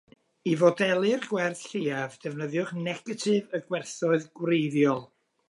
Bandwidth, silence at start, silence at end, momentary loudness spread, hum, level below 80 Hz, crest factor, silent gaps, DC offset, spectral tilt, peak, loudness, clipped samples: 11.5 kHz; 0.45 s; 0.45 s; 10 LU; none; -78 dBFS; 20 dB; none; under 0.1%; -5.5 dB/octave; -8 dBFS; -27 LUFS; under 0.1%